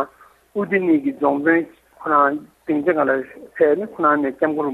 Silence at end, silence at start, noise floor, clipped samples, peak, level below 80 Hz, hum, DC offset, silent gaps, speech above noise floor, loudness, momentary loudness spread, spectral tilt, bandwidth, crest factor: 0 s; 0 s; -47 dBFS; under 0.1%; -4 dBFS; -64 dBFS; none; under 0.1%; none; 29 dB; -19 LUFS; 13 LU; -8.5 dB/octave; 4.1 kHz; 16 dB